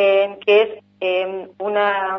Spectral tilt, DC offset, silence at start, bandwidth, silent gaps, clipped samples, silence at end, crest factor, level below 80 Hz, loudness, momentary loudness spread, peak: -5.5 dB/octave; under 0.1%; 0 s; 5.8 kHz; none; under 0.1%; 0 s; 16 dB; -78 dBFS; -19 LUFS; 10 LU; -4 dBFS